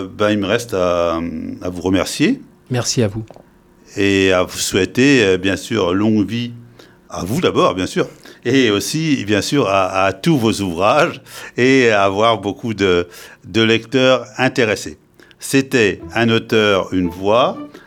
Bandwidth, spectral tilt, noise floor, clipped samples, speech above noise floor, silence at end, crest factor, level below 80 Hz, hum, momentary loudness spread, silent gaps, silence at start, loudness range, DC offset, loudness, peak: 18.5 kHz; -4.5 dB/octave; -43 dBFS; under 0.1%; 27 dB; 0.1 s; 16 dB; -48 dBFS; none; 11 LU; none; 0 s; 3 LU; under 0.1%; -16 LUFS; 0 dBFS